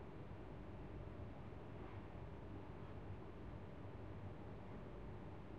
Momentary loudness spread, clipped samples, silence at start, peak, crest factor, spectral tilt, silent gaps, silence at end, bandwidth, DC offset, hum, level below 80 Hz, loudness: 1 LU; under 0.1%; 0 s; -40 dBFS; 14 dB; -8.5 dB/octave; none; 0 s; 8 kHz; 0.1%; none; -60 dBFS; -55 LUFS